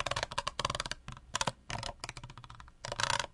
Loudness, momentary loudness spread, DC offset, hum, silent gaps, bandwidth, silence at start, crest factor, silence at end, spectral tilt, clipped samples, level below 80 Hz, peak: -37 LUFS; 16 LU; under 0.1%; none; none; 11.5 kHz; 0 s; 26 dB; 0 s; -2 dB/octave; under 0.1%; -52 dBFS; -12 dBFS